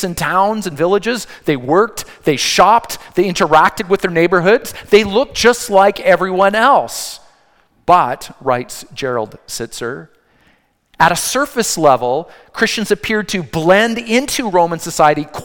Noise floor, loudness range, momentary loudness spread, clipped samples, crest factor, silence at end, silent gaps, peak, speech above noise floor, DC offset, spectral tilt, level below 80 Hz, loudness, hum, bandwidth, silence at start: -56 dBFS; 7 LU; 11 LU; 0.3%; 14 dB; 0 s; none; 0 dBFS; 41 dB; under 0.1%; -3.5 dB/octave; -46 dBFS; -14 LUFS; none; 18.5 kHz; 0 s